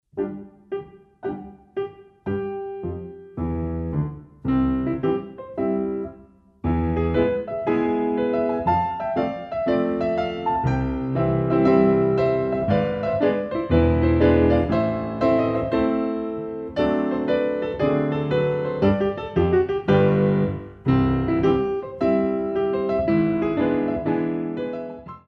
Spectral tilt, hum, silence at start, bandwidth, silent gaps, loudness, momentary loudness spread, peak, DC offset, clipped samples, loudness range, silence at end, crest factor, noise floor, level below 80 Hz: -9.5 dB/octave; none; 0.15 s; 6.2 kHz; none; -22 LUFS; 13 LU; -4 dBFS; under 0.1%; under 0.1%; 6 LU; 0.1 s; 18 dB; -50 dBFS; -38 dBFS